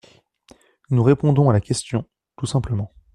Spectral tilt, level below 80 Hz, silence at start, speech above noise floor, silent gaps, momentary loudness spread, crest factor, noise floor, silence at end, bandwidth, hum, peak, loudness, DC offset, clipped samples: -7 dB/octave; -46 dBFS; 0.9 s; 35 dB; none; 11 LU; 18 dB; -54 dBFS; 0.25 s; 11.5 kHz; none; -2 dBFS; -20 LUFS; under 0.1%; under 0.1%